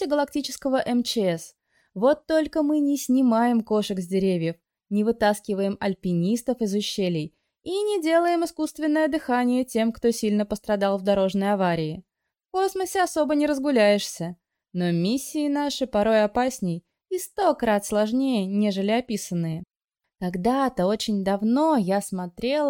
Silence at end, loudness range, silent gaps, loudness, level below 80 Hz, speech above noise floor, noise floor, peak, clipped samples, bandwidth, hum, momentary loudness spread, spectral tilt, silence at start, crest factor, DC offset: 0 s; 2 LU; 19.84-19.88 s; -24 LUFS; -56 dBFS; 60 dB; -84 dBFS; -8 dBFS; under 0.1%; 17.5 kHz; none; 10 LU; -5.5 dB/octave; 0 s; 16 dB; under 0.1%